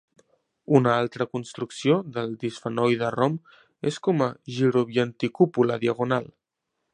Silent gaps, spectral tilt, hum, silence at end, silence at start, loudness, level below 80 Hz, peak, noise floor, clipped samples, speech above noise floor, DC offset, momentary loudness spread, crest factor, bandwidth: none; -7 dB/octave; none; 0.7 s; 0.7 s; -25 LUFS; -66 dBFS; -2 dBFS; -80 dBFS; under 0.1%; 57 dB; under 0.1%; 10 LU; 22 dB; 10 kHz